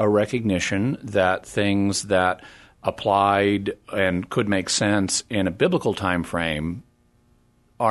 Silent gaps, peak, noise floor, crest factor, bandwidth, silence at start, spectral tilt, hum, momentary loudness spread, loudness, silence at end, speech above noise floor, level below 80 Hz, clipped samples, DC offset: none; -4 dBFS; -60 dBFS; 18 dB; 12.5 kHz; 0 s; -4.5 dB/octave; none; 7 LU; -22 LUFS; 0 s; 38 dB; -50 dBFS; under 0.1%; under 0.1%